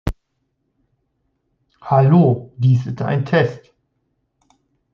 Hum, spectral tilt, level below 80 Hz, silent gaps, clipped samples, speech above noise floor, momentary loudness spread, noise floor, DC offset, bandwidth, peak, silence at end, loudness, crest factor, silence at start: none; -9.5 dB/octave; -42 dBFS; none; under 0.1%; 55 dB; 10 LU; -71 dBFS; under 0.1%; 6.6 kHz; -2 dBFS; 1.35 s; -17 LUFS; 18 dB; 0.05 s